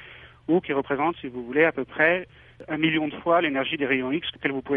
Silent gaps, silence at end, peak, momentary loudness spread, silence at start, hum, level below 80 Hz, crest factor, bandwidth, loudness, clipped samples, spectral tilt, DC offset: none; 0 s; -6 dBFS; 11 LU; 0 s; none; -58 dBFS; 20 dB; 4.1 kHz; -24 LUFS; under 0.1%; -8.5 dB/octave; under 0.1%